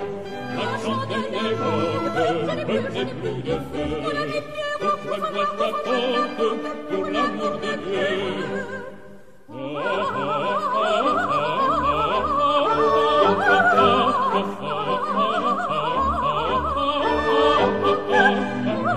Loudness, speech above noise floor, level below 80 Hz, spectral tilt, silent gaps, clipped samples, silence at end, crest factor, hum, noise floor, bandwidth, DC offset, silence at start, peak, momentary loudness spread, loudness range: -22 LUFS; 22 dB; -46 dBFS; -5.5 dB/octave; none; under 0.1%; 0 s; 18 dB; none; -46 dBFS; 13.5 kHz; 0.8%; 0 s; -4 dBFS; 10 LU; 7 LU